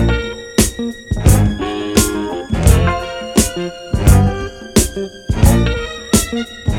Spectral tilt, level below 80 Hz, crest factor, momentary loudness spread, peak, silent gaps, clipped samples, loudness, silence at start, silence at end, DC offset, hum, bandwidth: -5 dB/octave; -20 dBFS; 14 dB; 10 LU; 0 dBFS; none; under 0.1%; -16 LUFS; 0 s; 0 s; under 0.1%; none; 17.5 kHz